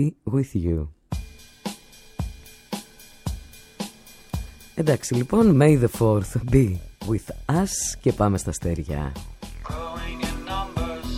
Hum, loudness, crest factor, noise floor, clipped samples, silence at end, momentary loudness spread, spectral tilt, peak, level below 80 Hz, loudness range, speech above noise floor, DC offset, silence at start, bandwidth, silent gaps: none; -24 LUFS; 20 dB; -43 dBFS; under 0.1%; 0 s; 17 LU; -6 dB/octave; -4 dBFS; -36 dBFS; 15 LU; 22 dB; under 0.1%; 0 s; 16.5 kHz; none